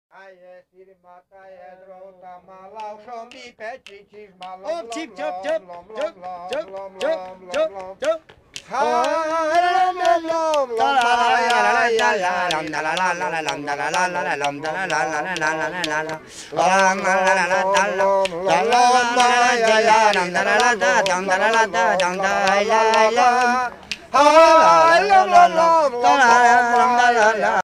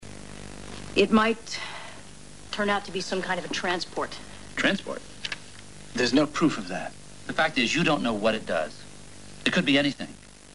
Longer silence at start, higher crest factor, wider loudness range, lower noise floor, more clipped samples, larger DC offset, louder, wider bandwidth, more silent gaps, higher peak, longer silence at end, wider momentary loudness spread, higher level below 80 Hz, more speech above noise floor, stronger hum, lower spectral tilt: first, 0.5 s vs 0 s; second, 18 dB vs 24 dB; first, 16 LU vs 4 LU; about the same, -44 dBFS vs -47 dBFS; neither; second, under 0.1% vs 0.7%; first, -17 LUFS vs -26 LUFS; first, 13.5 kHz vs 11.5 kHz; neither; about the same, -2 dBFS vs -4 dBFS; about the same, 0 s vs 0 s; second, 16 LU vs 20 LU; about the same, -58 dBFS vs -54 dBFS; first, 26 dB vs 21 dB; second, none vs 50 Hz at -55 dBFS; second, -2.5 dB/octave vs -4 dB/octave